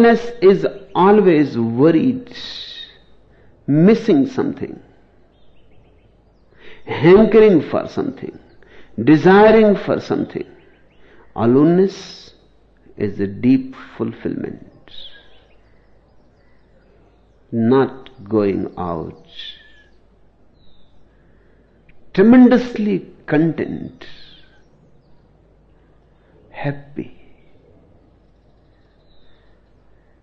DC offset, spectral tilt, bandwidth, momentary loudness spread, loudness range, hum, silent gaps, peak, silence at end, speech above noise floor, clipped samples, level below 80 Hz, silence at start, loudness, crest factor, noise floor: under 0.1%; -8.5 dB/octave; 6.8 kHz; 23 LU; 19 LU; none; none; -2 dBFS; 3.1 s; 38 dB; under 0.1%; -50 dBFS; 0 s; -15 LUFS; 16 dB; -53 dBFS